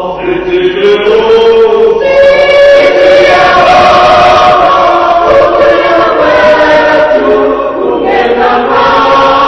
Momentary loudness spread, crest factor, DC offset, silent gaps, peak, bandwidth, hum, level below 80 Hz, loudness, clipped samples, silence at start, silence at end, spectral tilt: 5 LU; 4 dB; under 0.1%; none; 0 dBFS; 9 kHz; none; -32 dBFS; -5 LUFS; 7%; 0 s; 0 s; -4.5 dB/octave